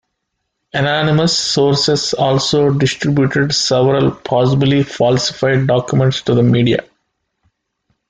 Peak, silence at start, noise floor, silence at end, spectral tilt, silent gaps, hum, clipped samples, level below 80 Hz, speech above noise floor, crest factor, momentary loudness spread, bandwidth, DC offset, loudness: -2 dBFS; 0.75 s; -73 dBFS; 1.3 s; -5 dB/octave; none; none; under 0.1%; -48 dBFS; 59 dB; 12 dB; 3 LU; 9.4 kHz; under 0.1%; -14 LUFS